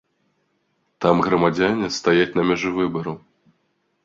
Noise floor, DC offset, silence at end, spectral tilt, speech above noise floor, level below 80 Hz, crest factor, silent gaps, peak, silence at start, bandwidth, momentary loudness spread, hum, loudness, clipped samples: -69 dBFS; under 0.1%; 0.85 s; -5.5 dB/octave; 50 dB; -54 dBFS; 20 dB; none; -2 dBFS; 1 s; 7.6 kHz; 9 LU; none; -20 LUFS; under 0.1%